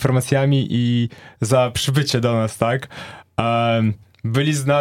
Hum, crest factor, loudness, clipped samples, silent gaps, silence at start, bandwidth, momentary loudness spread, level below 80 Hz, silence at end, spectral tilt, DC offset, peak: none; 18 dB; -19 LUFS; under 0.1%; none; 0 s; 16 kHz; 10 LU; -50 dBFS; 0 s; -5.5 dB/octave; under 0.1%; 0 dBFS